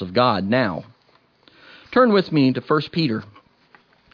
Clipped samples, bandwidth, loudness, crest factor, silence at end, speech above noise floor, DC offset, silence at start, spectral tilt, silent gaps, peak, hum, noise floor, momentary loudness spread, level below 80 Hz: under 0.1%; 5.4 kHz; -20 LUFS; 18 dB; 0.9 s; 40 dB; under 0.1%; 0 s; -8.5 dB/octave; none; -4 dBFS; none; -59 dBFS; 9 LU; -62 dBFS